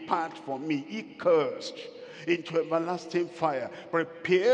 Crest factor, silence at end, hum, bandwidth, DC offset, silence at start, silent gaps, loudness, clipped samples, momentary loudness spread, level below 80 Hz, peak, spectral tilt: 18 dB; 0 s; none; 9 kHz; under 0.1%; 0 s; none; -30 LUFS; under 0.1%; 13 LU; -80 dBFS; -10 dBFS; -5.5 dB/octave